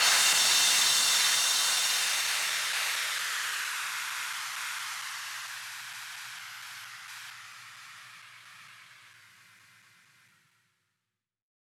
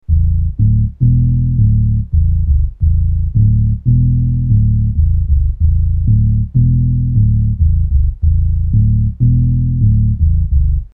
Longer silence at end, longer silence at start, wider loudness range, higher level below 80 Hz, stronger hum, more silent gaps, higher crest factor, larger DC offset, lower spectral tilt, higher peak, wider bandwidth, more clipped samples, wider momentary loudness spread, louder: first, 2.55 s vs 0.05 s; about the same, 0 s vs 0.1 s; first, 23 LU vs 0 LU; second, under -90 dBFS vs -16 dBFS; neither; neither; first, 20 dB vs 10 dB; neither; second, 3.5 dB/octave vs -15 dB/octave; second, -12 dBFS vs -2 dBFS; first, 19 kHz vs 0.5 kHz; neither; first, 23 LU vs 3 LU; second, -26 LUFS vs -14 LUFS